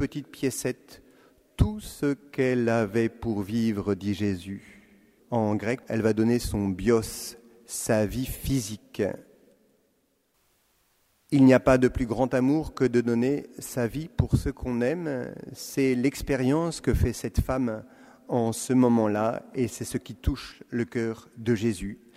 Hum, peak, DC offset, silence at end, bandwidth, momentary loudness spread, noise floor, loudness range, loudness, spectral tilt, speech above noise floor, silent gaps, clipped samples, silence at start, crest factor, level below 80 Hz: none; -6 dBFS; under 0.1%; 0.2 s; 16 kHz; 11 LU; -70 dBFS; 5 LU; -27 LUFS; -6.5 dB/octave; 44 dB; none; under 0.1%; 0 s; 20 dB; -42 dBFS